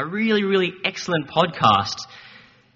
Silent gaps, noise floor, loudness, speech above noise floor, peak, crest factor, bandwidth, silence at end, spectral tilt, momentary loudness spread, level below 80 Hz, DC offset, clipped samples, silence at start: none; -48 dBFS; -20 LUFS; 27 dB; -2 dBFS; 20 dB; 7.6 kHz; 0.45 s; -3 dB/octave; 11 LU; -58 dBFS; under 0.1%; under 0.1%; 0 s